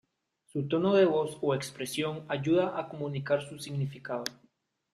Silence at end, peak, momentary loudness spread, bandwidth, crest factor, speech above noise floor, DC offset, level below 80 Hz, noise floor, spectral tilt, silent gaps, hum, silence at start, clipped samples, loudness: 0.6 s; -12 dBFS; 12 LU; 15 kHz; 18 dB; 39 dB; under 0.1%; -70 dBFS; -69 dBFS; -6 dB/octave; none; none; 0.55 s; under 0.1%; -31 LUFS